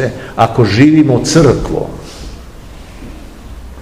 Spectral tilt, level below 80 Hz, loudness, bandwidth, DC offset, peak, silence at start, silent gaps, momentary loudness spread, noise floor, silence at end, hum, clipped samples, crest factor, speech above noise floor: -6 dB/octave; -30 dBFS; -10 LUFS; 13 kHz; 0.8%; 0 dBFS; 0 s; none; 25 LU; -31 dBFS; 0 s; none; 0.9%; 12 dB; 22 dB